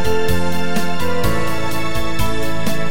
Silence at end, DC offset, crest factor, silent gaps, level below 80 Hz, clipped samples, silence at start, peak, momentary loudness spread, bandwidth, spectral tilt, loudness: 0 s; 20%; 16 dB; none; -32 dBFS; under 0.1%; 0 s; -2 dBFS; 3 LU; 17 kHz; -5 dB/octave; -21 LUFS